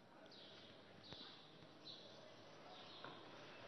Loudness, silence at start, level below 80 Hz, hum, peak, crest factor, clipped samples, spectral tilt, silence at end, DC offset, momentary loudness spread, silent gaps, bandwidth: -59 LUFS; 0 s; under -90 dBFS; none; -34 dBFS; 24 dB; under 0.1%; -2 dB/octave; 0 s; under 0.1%; 5 LU; none; 6.2 kHz